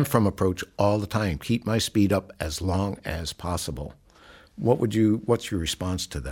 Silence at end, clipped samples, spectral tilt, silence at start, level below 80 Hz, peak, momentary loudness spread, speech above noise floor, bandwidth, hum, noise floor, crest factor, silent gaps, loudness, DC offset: 0 s; under 0.1%; -5.5 dB/octave; 0 s; -44 dBFS; -6 dBFS; 9 LU; 27 dB; 17 kHz; none; -52 dBFS; 20 dB; none; -26 LUFS; under 0.1%